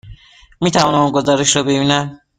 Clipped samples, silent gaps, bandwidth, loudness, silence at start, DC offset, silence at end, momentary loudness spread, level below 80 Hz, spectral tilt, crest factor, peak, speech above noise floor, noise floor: under 0.1%; none; 9.6 kHz; -14 LUFS; 0.05 s; under 0.1%; 0.25 s; 4 LU; -46 dBFS; -4 dB/octave; 16 dB; 0 dBFS; 27 dB; -41 dBFS